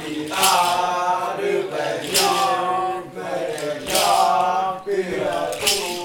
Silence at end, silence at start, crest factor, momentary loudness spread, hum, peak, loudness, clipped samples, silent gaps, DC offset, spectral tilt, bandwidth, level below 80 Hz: 0 s; 0 s; 18 dB; 9 LU; none; -4 dBFS; -20 LUFS; under 0.1%; none; under 0.1%; -2 dB/octave; 19 kHz; -56 dBFS